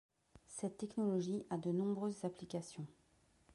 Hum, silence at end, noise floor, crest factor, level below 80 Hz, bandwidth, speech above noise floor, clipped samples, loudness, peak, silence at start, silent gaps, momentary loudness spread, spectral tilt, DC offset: none; 0 s; -73 dBFS; 14 dB; -78 dBFS; 11.5 kHz; 32 dB; under 0.1%; -42 LUFS; -28 dBFS; 0.35 s; none; 13 LU; -7 dB/octave; under 0.1%